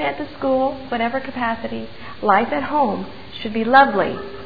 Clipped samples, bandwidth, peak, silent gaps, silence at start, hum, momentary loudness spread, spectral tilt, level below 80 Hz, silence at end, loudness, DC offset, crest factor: under 0.1%; 5 kHz; 0 dBFS; none; 0 s; none; 16 LU; -7.5 dB/octave; -50 dBFS; 0 s; -19 LUFS; 1%; 20 dB